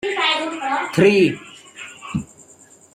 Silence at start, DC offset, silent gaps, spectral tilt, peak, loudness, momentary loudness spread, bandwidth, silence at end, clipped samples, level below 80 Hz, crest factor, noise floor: 0.05 s; under 0.1%; none; -5 dB/octave; -2 dBFS; -19 LUFS; 22 LU; 13 kHz; 0.7 s; under 0.1%; -56 dBFS; 18 dB; -49 dBFS